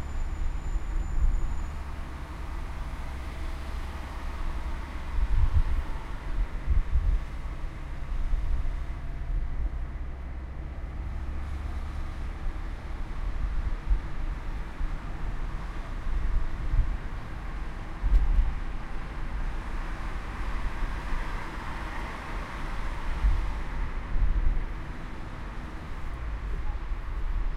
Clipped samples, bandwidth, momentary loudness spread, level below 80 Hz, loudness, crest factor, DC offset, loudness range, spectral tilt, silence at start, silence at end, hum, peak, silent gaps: under 0.1%; 7.6 kHz; 9 LU; -30 dBFS; -35 LUFS; 18 dB; under 0.1%; 5 LU; -6.5 dB/octave; 0 s; 0 s; none; -10 dBFS; none